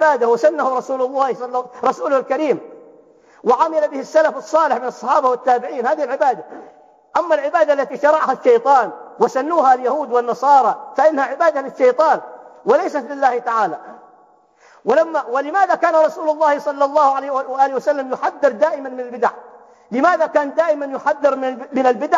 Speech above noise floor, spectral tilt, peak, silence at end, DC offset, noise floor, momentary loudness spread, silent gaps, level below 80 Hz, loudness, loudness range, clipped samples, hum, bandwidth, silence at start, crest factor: 35 dB; -4.5 dB/octave; -2 dBFS; 0 s; under 0.1%; -52 dBFS; 8 LU; none; -78 dBFS; -17 LUFS; 4 LU; under 0.1%; none; 7.6 kHz; 0 s; 16 dB